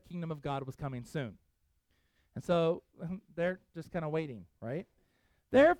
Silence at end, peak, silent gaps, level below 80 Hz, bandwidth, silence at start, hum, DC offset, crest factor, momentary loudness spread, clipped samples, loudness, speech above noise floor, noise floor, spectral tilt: 0 s; -14 dBFS; none; -64 dBFS; 12.5 kHz; 0.1 s; none; under 0.1%; 20 dB; 14 LU; under 0.1%; -36 LUFS; 42 dB; -75 dBFS; -7.5 dB/octave